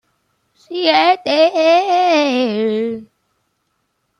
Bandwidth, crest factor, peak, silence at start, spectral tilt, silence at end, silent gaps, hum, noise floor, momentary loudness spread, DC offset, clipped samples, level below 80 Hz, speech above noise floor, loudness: 9.8 kHz; 16 dB; 0 dBFS; 0.7 s; -4 dB/octave; 1.15 s; none; none; -68 dBFS; 10 LU; under 0.1%; under 0.1%; -68 dBFS; 54 dB; -14 LUFS